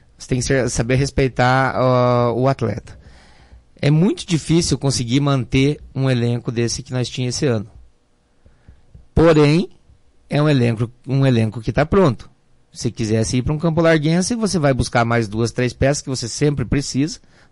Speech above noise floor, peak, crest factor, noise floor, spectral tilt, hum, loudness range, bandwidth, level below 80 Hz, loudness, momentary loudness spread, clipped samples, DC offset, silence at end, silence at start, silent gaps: 40 dB; -6 dBFS; 12 dB; -57 dBFS; -6 dB/octave; none; 2 LU; 11.5 kHz; -38 dBFS; -18 LUFS; 9 LU; under 0.1%; under 0.1%; 0.35 s; 0.2 s; none